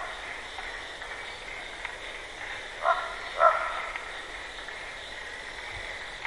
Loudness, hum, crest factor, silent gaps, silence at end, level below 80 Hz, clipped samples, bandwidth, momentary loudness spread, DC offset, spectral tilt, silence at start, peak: -32 LUFS; none; 26 dB; none; 0 s; -54 dBFS; under 0.1%; 11.5 kHz; 14 LU; under 0.1%; -2 dB/octave; 0 s; -8 dBFS